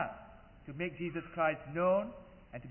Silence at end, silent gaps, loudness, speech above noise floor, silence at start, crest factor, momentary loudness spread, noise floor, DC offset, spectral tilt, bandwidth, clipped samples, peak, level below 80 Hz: 0 s; none; -35 LUFS; 20 dB; 0 s; 18 dB; 22 LU; -55 dBFS; under 0.1%; -2.5 dB/octave; 3.1 kHz; under 0.1%; -18 dBFS; -62 dBFS